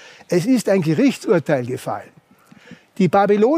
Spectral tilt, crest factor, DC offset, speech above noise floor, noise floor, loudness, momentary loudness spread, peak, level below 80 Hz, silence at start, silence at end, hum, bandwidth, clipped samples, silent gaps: -6.5 dB/octave; 14 dB; under 0.1%; 31 dB; -48 dBFS; -18 LUFS; 11 LU; -4 dBFS; -66 dBFS; 0.3 s; 0 s; none; 15.5 kHz; under 0.1%; none